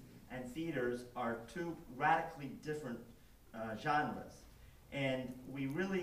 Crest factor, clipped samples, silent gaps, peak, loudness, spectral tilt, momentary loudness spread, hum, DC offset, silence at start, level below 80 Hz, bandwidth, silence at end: 22 dB; under 0.1%; none; -20 dBFS; -40 LUFS; -6 dB/octave; 15 LU; none; under 0.1%; 0 s; -64 dBFS; 15.5 kHz; 0 s